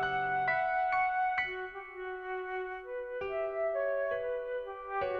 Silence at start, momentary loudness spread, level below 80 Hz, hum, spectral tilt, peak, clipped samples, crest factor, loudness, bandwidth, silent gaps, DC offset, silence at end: 0 s; 10 LU; -62 dBFS; none; -6 dB/octave; -20 dBFS; under 0.1%; 14 dB; -34 LUFS; 6.2 kHz; none; under 0.1%; 0 s